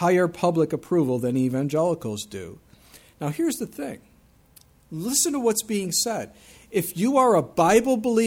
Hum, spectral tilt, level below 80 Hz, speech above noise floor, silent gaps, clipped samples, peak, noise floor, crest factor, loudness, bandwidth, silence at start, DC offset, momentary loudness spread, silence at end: none; -4.5 dB/octave; -58 dBFS; 32 dB; none; under 0.1%; -6 dBFS; -55 dBFS; 18 dB; -23 LUFS; over 20 kHz; 0 s; under 0.1%; 16 LU; 0 s